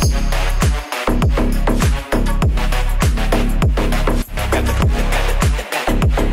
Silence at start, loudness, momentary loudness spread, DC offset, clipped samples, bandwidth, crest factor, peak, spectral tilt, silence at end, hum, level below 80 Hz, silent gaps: 0 s; -18 LUFS; 3 LU; 0.3%; under 0.1%; 16 kHz; 12 dB; -2 dBFS; -5.5 dB/octave; 0 s; none; -16 dBFS; none